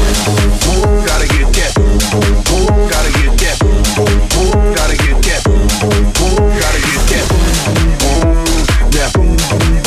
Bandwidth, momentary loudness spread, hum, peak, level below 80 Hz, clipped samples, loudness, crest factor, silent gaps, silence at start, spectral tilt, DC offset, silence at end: 15 kHz; 1 LU; none; -2 dBFS; -12 dBFS; under 0.1%; -12 LUFS; 8 dB; none; 0 s; -4 dB/octave; under 0.1%; 0 s